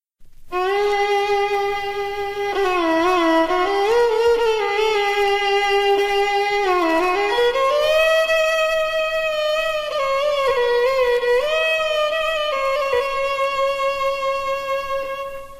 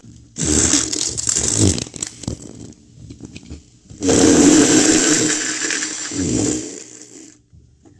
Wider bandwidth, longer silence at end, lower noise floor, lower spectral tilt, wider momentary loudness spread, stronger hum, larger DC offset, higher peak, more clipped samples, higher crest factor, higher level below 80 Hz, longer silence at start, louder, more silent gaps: first, 15.5 kHz vs 12 kHz; second, 0 s vs 0.75 s; second, -40 dBFS vs -49 dBFS; about the same, -2.5 dB/octave vs -3 dB/octave; second, 6 LU vs 23 LU; neither; neither; second, -8 dBFS vs 0 dBFS; neither; second, 12 dB vs 18 dB; about the same, -46 dBFS vs -42 dBFS; first, 0.2 s vs 0.05 s; second, -19 LUFS vs -15 LUFS; neither